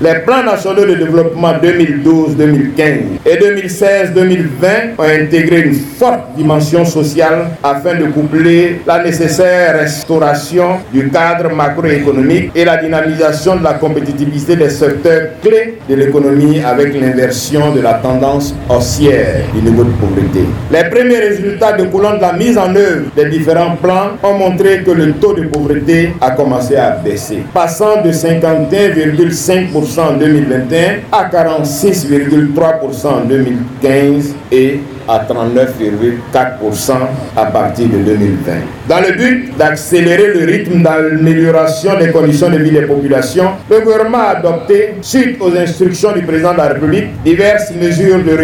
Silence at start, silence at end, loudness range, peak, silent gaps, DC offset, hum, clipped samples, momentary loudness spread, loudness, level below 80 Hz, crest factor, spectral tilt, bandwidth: 0 s; 0 s; 2 LU; 0 dBFS; none; under 0.1%; none; 0.4%; 4 LU; -10 LUFS; -36 dBFS; 10 dB; -6 dB/octave; 19 kHz